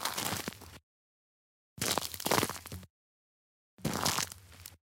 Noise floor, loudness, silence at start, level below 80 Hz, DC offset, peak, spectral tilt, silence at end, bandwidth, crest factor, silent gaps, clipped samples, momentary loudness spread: under -90 dBFS; -33 LUFS; 0 s; -62 dBFS; under 0.1%; -12 dBFS; -2.5 dB/octave; 0.15 s; 17 kHz; 26 dB; 0.83-1.76 s, 2.90-3.77 s; under 0.1%; 19 LU